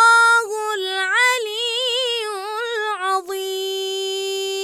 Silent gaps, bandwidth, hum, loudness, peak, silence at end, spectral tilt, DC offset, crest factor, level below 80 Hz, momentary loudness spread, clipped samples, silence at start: none; 18 kHz; none; -19 LUFS; -4 dBFS; 0 s; 2 dB/octave; under 0.1%; 16 dB; -76 dBFS; 9 LU; under 0.1%; 0 s